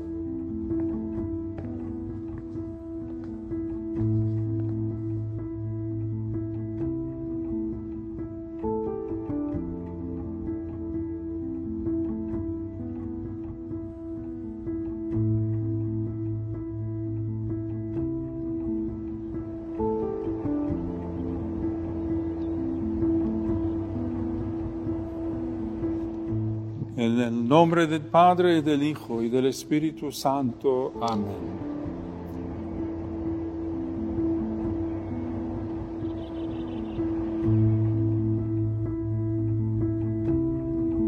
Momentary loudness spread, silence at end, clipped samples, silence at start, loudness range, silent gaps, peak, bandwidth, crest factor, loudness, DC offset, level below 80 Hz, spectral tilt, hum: 10 LU; 0 s; under 0.1%; 0 s; 9 LU; none; -4 dBFS; 13 kHz; 24 dB; -29 LUFS; under 0.1%; -44 dBFS; -8 dB/octave; none